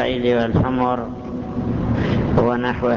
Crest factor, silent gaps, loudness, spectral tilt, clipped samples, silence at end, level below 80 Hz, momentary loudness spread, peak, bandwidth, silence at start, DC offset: 14 dB; none; -20 LUFS; -8.5 dB/octave; under 0.1%; 0 s; -34 dBFS; 8 LU; -6 dBFS; 7 kHz; 0 s; under 0.1%